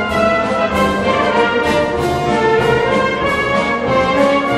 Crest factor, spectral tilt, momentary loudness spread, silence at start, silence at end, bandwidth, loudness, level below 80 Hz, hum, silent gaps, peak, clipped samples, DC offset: 12 dB; -5.5 dB/octave; 3 LU; 0 s; 0 s; 15 kHz; -14 LUFS; -36 dBFS; none; none; -2 dBFS; under 0.1%; under 0.1%